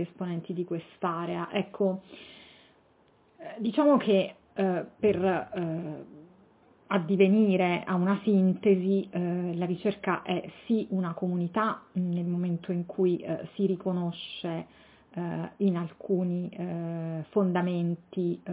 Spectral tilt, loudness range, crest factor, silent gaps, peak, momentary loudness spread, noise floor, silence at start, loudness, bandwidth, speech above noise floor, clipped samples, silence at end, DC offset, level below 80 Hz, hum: -6.5 dB/octave; 6 LU; 18 dB; none; -10 dBFS; 12 LU; -63 dBFS; 0 s; -29 LUFS; 4 kHz; 35 dB; under 0.1%; 0 s; under 0.1%; -68 dBFS; none